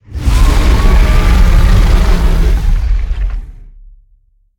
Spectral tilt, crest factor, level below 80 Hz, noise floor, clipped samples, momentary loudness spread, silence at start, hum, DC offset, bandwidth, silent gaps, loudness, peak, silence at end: -6 dB/octave; 10 dB; -10 dBFS; -50 dBFS; under 0.1%; 8 LU; 0.1 s; none; under 0.1%; 15.5 kHz; none; -13 LUFS; 0 dBFS; 0.9 s